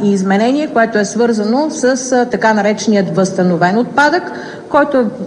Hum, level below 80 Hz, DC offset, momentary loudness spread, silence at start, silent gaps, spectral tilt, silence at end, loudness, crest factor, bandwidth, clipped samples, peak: none; -56 dBFS; under 0.1%; 3 LU; 0 s; none; -5 dB/octave; 0 s; -13 LUFS; 12 dB; 10 kHz; under 0.1%; 0 dBFS